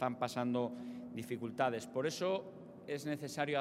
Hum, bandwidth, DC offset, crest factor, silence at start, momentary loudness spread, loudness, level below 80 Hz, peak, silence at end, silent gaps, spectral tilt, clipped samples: none; 16 kHz; under 0.1%; 20 dB; 0 s; 10 LU; -39 LUFS; -82 dBFS; -18 dBFS; 0 s; none; -5 dB/octave; under 0.1%